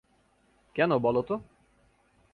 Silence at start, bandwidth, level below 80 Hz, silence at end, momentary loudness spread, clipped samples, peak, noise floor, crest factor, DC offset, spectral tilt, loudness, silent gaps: 0.75 s; 4.8 kHz; -64 dBFS; 0.9 s; 11 LU; under 0.1%; -12 dBFS; -67 dBFS; 20 dB; under 0.1%; -8.5 dB/octave; -28 LUFS; none